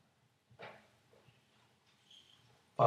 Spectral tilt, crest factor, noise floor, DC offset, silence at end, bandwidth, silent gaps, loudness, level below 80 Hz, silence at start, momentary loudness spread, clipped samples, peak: -7.5 dB/octave; 28 dB; -74 dBFS; under 0.1%; 0 s; 13.5 kHz; none; -57 LUFS; under -90 dBFS; 0.6 s; 15 LU; under 0.1%; -14 dBFS